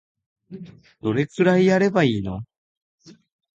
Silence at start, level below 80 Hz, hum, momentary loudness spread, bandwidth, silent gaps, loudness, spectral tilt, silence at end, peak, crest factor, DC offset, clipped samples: 0.5 s; -54 dBFS; none; 23 LU; 7.8 kHz; 2.58-2.98 s; -20 LUFS; -7 dB/octave; 0.45 s; -6 dBFS; 16 dB; under 0.1%; under 0.1%